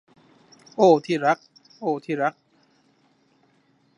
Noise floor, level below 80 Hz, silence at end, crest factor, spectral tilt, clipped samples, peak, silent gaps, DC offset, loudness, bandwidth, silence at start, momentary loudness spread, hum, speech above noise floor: -63 dBFS; -80 dBFS; 1.65 s; 22 dB; -6 dB/octave; under 0.1%; -4 dBFS; none; under 0.1%; -22 LUFS; 10.5 kHz; 0.8 s; 12 LU; none; 42 dB